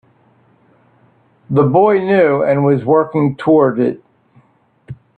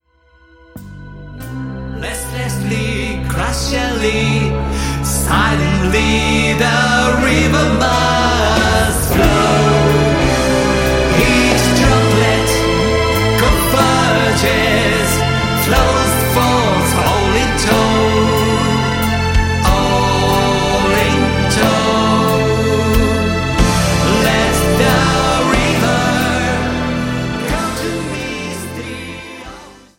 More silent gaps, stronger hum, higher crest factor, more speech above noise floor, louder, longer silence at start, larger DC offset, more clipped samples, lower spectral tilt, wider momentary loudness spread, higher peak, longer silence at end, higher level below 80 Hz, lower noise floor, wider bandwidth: neither; neither; about the same, 14 dB vs 14 dB; first, 41 dB vs 37 dB; about the same, -13 LUFS vs -13 LUFS; first, 1.5 s vs 0.75 s; neither; neither; first, -10 dB/octave vs -4.5 dB/octave; about the same, 7 LU vs 9 LU; about the same, 0 dBFS vs 0 dBFS; about the same, 0.25 s vs 0.25 s; second, -56 dBFS vs -24 dBFS; first, -54 dBFS vs -50 dBFS; second, 4.5 kHz vs 16.5 kHz